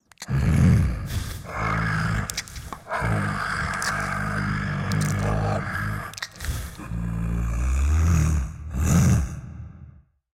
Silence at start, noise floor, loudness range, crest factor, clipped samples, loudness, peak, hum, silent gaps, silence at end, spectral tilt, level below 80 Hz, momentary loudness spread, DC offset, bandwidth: 0.2 s; -48 dBFS; 3 LU; 18 dB; under 0.1%; -25 LUFS; -6 dBFS; none; none; 0.5 s; -5.5 dB/octave; -30 dBFS; 13 LU; under 0.1%; 16.5 kHz